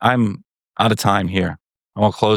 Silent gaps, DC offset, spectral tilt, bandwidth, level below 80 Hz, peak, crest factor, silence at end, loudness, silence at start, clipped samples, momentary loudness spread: none; under 0.1%; -5.5 dB/octave; 18 kHz; -50 dBFS; -2 dBFS; 18 dB; 0 s; -19 LUFS; 0 s; under 0.1%; 18 LU